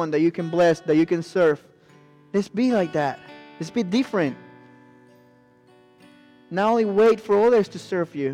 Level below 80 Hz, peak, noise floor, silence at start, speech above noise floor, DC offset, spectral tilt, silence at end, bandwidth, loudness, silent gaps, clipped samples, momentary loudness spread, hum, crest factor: -66 dBFS; -10 dBFS; -55 dBFS; 0 s; 34 dB; under 0.1%; -6.5 dB/octave; 0 s; 11 kHz; -22 LUFS; none; under 0.1%; 11 LU; none; 12 dB